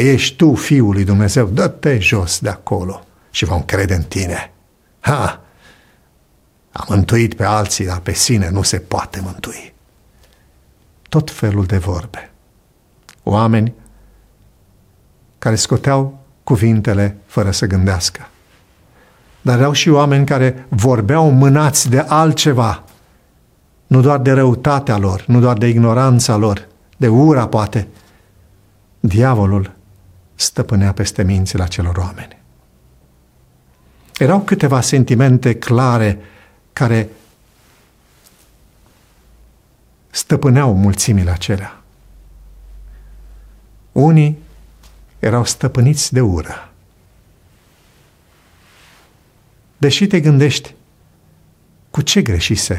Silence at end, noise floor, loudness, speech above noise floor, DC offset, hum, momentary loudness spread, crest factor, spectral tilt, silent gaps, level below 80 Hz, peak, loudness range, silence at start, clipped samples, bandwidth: 0 s; -54 dBFS; -14 LUFS; 41 dB; under 0.1%; none; 13 LU; 14 dB; -5.5 dB/octave; none; -38 dBFS; 0 dBFS; 8 LU; 0 s; under 0.1%; 15.5 kHz